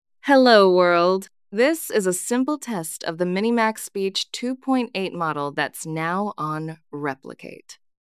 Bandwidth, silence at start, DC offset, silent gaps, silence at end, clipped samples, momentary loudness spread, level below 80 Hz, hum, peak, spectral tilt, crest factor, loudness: 16 kHz; 0.25 s; under 0.1%; none; 0.3 s; under 0.1%; 15 LU; -78 dBFS; none; -2 dBFS; -4.5 dB/octave; 20 dB; -21 LUFS